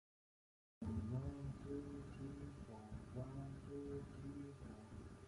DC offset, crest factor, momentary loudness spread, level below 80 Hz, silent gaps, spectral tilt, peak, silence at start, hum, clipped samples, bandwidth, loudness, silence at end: under 0.1%; 18 dB; 9 LU; -60 dBFS; none; -8.5 dB/octave; -34 dBFS; 0.8 s; none; under 0.1%; 11.5 kHz; -51 LUFS; 0 s